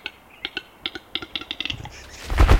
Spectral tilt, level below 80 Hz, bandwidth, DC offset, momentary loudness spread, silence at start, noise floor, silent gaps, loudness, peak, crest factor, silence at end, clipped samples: -5 dB/octave; -26 dBFS; 16 kHz; under 0.1%; 9 LU; 0.05 s; -39 dBFS; none; -30 LUFS; -2 dBFS; 20 dB; 0 s; under 0.1%